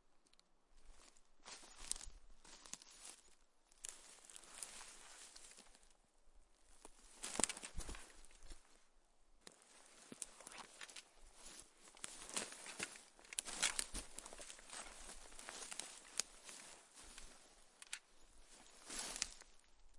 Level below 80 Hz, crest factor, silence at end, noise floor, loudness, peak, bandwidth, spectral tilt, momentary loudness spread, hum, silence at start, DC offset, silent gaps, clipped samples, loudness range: -64 dBFS; 40 dB; 0 s; -72 dBFS; -48 LUFS; -14 dBFS; 11.5 kHz; 0 dB/octave; 20 LU; none; 0.05 s; under 0.1%; none; under 0.1%; 11 LU